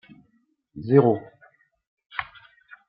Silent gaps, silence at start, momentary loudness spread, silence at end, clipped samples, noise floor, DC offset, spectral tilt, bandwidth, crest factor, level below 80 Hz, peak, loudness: 1.87-1.97 s; 0.75 s; 24 LU; 0.65 s; under 0.1%; -67 dBFS; under 0.1%; -12 dB/octave; 5 kHz; 24 dB; -66 dBFS; -4 dBFS; -23 LUFS